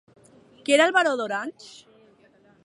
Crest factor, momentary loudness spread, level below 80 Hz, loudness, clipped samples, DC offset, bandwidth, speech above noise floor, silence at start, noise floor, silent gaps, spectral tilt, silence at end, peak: 20 dB; 17 LU; -78 dBFS; -21 LUFS; under 0.1%; under 0.1%; 11.5 kHz; 35 dB; 0.7 s; -58 dBFS; none; -2 dB/octave; 0.95 s; -6 dBFS